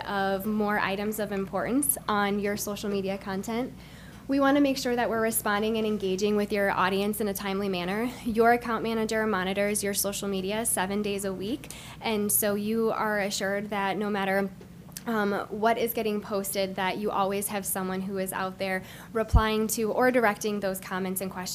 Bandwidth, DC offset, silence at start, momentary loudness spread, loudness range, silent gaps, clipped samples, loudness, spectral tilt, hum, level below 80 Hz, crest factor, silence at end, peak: 16 kHz; under 0.1%; 0 s; 8 LU; 2 LU; none; under 0.1%; -28 LUFS; -4 dB/octave; none; -44 dBFS; 20 dB; 0 s; -6 dBFS